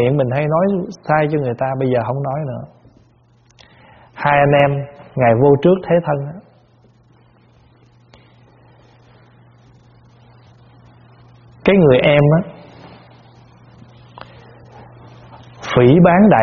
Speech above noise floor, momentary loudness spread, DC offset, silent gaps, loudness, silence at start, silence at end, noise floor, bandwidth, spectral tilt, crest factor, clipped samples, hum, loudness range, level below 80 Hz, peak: 39 dB; 15 LU; under 0.1%; none; -15 LUFS; 0 s; 0 s; -52 dBFS; 6.8 kHz; -6.5 dB/octave; 18 dB; under 0.1%; none; 8 LU; -48 dBFS; 0 dBFS